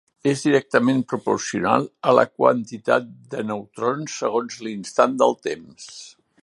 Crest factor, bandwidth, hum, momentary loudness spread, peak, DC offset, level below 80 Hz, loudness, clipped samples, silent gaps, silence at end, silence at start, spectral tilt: 22 dB; 11.5 kHz; none; 13 LU; 0 dBFS; under 0.1%; -66 dBFS; -21 LUFS; under 0.1%; none; 0.35 s; 0.25 s; -5 dB/octave